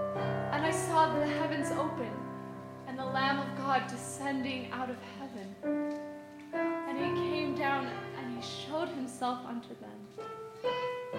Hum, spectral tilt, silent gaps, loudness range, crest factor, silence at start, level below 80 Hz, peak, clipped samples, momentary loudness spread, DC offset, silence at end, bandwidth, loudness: none; -5 dB/octave; none; 5 LU; 20 dB; 0 s; -70 dBFS; -14 dBFS; under 0.1%; 13 LU; under 0.1%; 0 s; 16.5 kHz; -34 LUFS